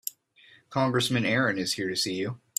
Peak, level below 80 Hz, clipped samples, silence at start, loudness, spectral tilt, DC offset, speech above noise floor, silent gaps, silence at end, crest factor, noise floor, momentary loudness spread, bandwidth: -12 dBFS; -66 dBFS; under 0.1%; 0.05 s; -27 LUFS; -4 dB/octave; under 0.1%; 31 dB; none; 0.2 s; 18 dB; -58 dBFS; 9 LU; 15.5 kHz